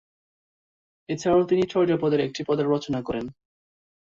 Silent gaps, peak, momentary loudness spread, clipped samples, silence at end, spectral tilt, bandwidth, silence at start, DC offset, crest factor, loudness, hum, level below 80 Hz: none; -10 dBFS; 11 LU; under 0.1%; 0.8 s; -6.5 dB/octave; 7.6 kHz; 1.1 s; under 0.1%; 16 dB; -24 LUFS; none; -58 dBFS